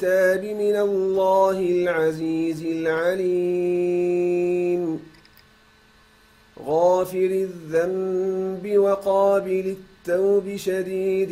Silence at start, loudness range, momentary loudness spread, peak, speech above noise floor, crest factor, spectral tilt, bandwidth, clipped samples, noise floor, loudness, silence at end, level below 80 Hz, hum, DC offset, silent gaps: 0 s; 4 LU; 7 LU; -8 dBFS; 33 dB; 14 dB; -6.5 dB/octave; 15.5 kHz; under 0.1%; -55 dBFS; -22 LUFS; 0 s; -62 dBFS; none; under 0.1%; none